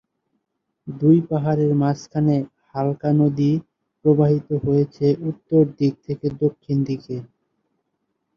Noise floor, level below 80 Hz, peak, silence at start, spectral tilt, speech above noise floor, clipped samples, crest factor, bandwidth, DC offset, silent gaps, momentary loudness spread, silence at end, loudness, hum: -76 dBFS; -56 dBFS; -4 dBFS; 0.85 s; -9.5 dB/octave; 56 dB; under 0.1%; 16 dB; 6.8 kHz; under 0.1%; none; 10 LU; 1.15 s; -20 LUFS; none